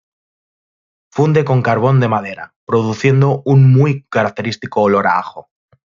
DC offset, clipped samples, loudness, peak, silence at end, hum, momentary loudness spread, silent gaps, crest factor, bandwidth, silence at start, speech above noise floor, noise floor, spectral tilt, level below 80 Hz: under 0.1%; under 0.1%; -14 LUFS; -2 dBFS; 0.55 s; none; 11 LU; 2.56-2.67 s; 12 dB; 7.2 kHz; 1.15 s; over 77 dB; under -90 dBFS; -8 dB/octave; -56 dBFS